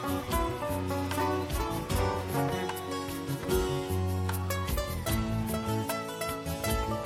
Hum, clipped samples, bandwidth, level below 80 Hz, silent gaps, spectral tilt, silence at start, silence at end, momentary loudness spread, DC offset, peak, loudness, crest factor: none; under 0.1%; 16.5 kHz; -40 dBFS; none; -5.5 dB/octave; 0 s; 0 s; 4 LU; under 0.1%; -14 dBFS; -32 LUFS; 16 dB